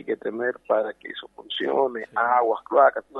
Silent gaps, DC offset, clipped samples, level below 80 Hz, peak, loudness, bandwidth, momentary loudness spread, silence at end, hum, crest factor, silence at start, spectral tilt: none; under 0.1%; under 0.1%; -72 dBFS; -4 dBFS; -23 LUFS; 4.1 kHz; 15 LU; 0 s; none; 20 dB; 0.05 s; -5.5 dB/octave